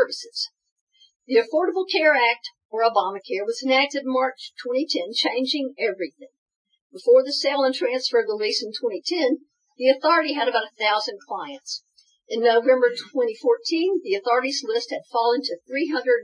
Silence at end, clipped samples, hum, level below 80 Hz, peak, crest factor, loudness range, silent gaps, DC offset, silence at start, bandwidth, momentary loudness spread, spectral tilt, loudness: 0 s; under 0.1%; none; under -90 dBFS; -4 dBFS; 18 dB; 2 LU; 0.71-0.87 s, 1.16-1.20 s, 2.65-2.69 s, 6.38-6.46 s, 6.56-6.65 s, 6.81-6.90 s; under 0.1%; 0 s; 10.5 kHz; 12 LU; -2 dB/octave; -22 LUFS